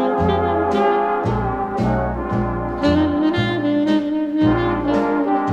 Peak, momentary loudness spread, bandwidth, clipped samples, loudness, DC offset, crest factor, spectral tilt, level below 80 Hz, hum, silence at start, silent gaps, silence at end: -6 dBFS; 5 LU; 7.8 kHz; under 0.1%; -19 LUFS; under 0.1%; 14 dB; -8 dB/octave; -34 dBFS; none; 0 s; none; 0 s